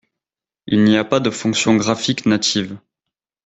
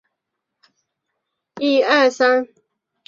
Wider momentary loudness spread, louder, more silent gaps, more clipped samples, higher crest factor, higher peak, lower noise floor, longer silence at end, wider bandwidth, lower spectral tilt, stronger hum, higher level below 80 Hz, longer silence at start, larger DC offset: second, 6 LU vs 9 LU; about the same, -17 LUFS vs -17 LUFS; neither; neither; about the same, 16 dB vs 20 dB; about the same, -2 dBFS vs -2 dBFS; first, -89 dBFS vs -79 dBFS; about the same, 0.7 s vs 0.6 s; first, 8.4 kHz vs 7.4 kHz; first, -4.5 dB/octave vs -2.5 dB/octave; neither; first, -56 dBFS vs -72 dBFS; second, 0.65 s vs 1.55 s; neither